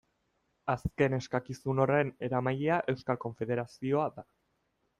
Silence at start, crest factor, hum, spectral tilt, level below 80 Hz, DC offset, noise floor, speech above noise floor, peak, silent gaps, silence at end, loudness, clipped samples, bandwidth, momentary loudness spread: 0.65 s; 20 dB; none; -7.5 dB/octave; -58 dBFS; under 0.1%; -77 dBFS; 46 dB; -14 dBFS; none; 0.75 s; -32 LUFS; under 0.1%; 11.5 kHz; 7 LU